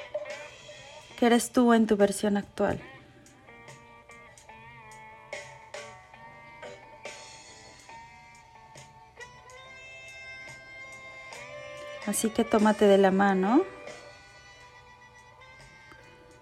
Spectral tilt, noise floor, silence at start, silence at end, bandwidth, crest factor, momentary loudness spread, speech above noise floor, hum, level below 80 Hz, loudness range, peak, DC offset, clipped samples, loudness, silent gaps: -5 dB/octave; -54 dBFS; 0 s; 2.3 s; 15.5 kHz; 22 dB; 27 LU; 31 dB; none; -62 dBFS; 21 LU; -8 dBFS; under 0.1%; under 0.1%; -25 LUFS; none